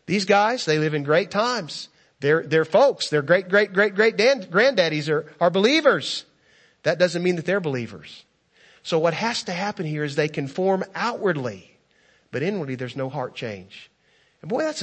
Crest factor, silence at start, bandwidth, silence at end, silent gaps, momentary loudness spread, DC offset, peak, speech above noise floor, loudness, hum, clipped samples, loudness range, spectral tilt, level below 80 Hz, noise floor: 20 dB; 0.1 s; 8.8 kHz; 0 s; none; 13 LU; under 0.1%; -4 dBFS; 40 dB; -22 LUFS; none; under 0.1%; 8 LU; -5 dB/octave; -70 dBFS; -62 dBFS